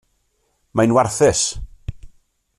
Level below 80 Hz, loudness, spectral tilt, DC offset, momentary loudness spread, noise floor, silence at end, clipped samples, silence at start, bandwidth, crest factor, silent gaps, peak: -40 dBFS; -17 LUFS; -4 dB/octave; under 0.1%; 20 LU; -66 dBFS; 0.5 s; under 0.1%; 0.75 s; 14 kHz; 18 dB; none; -2 dBFS